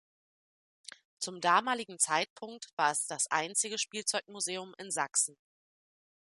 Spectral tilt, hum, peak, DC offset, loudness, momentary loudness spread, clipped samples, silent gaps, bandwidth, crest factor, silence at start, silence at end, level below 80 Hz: -0.5 dB/octave; none; -12 dBFS; under 0.1%; -32 LUFS; 15 LU; under 0.1%; 2.30-2.36 s, 2.73-2.77 s; 12 kHz; 22 dB; 1.2 s; 1 s; -88 dBFS